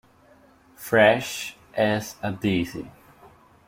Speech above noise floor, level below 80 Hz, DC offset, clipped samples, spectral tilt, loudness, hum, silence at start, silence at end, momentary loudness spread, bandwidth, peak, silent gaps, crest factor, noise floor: 33 dB; -58 dBFS; under 0.1%; under 0.1%; -5 dB/octave; -23 LUFS; none; 0.8 s; 0.4 s; 19 LU; 16.5 kHz; -4 dBFS; none; 22 dB; -55 dBFS